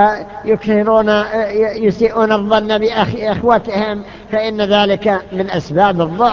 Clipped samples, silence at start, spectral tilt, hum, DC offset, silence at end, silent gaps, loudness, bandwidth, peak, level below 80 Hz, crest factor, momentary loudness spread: under 0.1%; 0 s; -6.5 dB/octave; none; under 0.1%; 0 s; none; -15 LUFS; 7.2 kHz; 0 dBFS; -42 dBFS; 14 dB; 7 LU